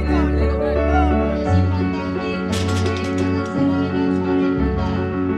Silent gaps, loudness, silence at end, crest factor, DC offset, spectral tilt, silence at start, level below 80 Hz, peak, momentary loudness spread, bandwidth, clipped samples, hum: none; -19 LUFS; 0 s; 14 dB; under 0.1%; -7.5 dB/octave; 0 s; -28 dBFS; -6 dBFS; 4 LU; 11 kHz; under 0.1%; none